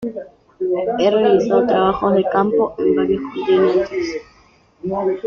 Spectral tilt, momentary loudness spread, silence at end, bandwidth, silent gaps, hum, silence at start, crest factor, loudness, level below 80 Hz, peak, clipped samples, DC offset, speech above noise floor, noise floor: -7 dB/octave; 11 LU; 0 s; 6.8 kHz; none; none; 0 s; 14 dB; -17 LUFS; -50 dBFS; -4 dBFS; under 0.1%; under 0.1%; 36 dB; -52 dBFS